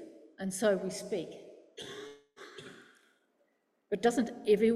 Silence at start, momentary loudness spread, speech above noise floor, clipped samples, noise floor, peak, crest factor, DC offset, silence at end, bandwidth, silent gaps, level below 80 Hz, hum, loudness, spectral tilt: 0 s; 22 LU; 45 dB; under 0.1%; -76 dBFS; -14 dBFS; 20 dB; under 0.1%; 0 s; 14.5 kHz; none; -74 dBFS; none; -33 LUFS; -5 dB/octave